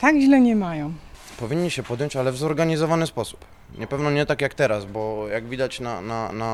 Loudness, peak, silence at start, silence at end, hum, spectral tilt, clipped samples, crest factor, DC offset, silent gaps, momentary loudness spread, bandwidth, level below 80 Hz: -23 LUFS; -6 dBFS; 0 s; 0 s; none; -6 dB/octave; under 0.1%; 18 dB; under 0.1%; none; 14 LU; 13 kHz; -50 dBFS